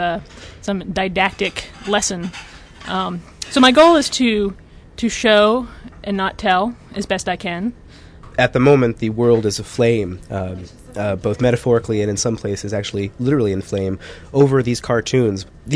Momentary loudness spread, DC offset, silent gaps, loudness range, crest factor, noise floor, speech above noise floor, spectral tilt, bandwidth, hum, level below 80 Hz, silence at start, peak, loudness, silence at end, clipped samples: 15 LU; under 0.1%; none; 5 LU; 16 dB; -40 dBFS; 22 dB; -5 dB/octave; 11 kHz; none; -42 dBFS; 0 s; -2 dBFS; -18 LUFS; 0 s; under 0.1%